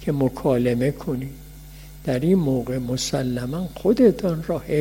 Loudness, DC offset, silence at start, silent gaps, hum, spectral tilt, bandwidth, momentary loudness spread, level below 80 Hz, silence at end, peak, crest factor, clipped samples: -22 LUFS; under 0.1%; 0 s; none; none; -6.5 dB/octave; 16.5 kHz; 17 LU; -42 dBFS; 0 s; -4 dBFS; 18 dB; under 0.1%